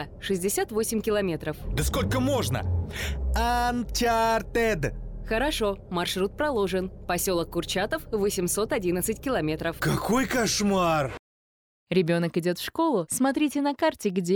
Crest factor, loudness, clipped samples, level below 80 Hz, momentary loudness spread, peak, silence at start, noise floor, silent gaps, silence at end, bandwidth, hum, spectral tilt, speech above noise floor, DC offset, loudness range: 16 dB; -26 LUFS; under 0.1%; -38 dBFS; 6 LU; -10 dBFS; 0 s; under -90 dBFS; 11.19-11.87 s; 0 s; over 20 kHz; none; -4.5 dB/octave; over 64 dB; under 0.1%; 1 LU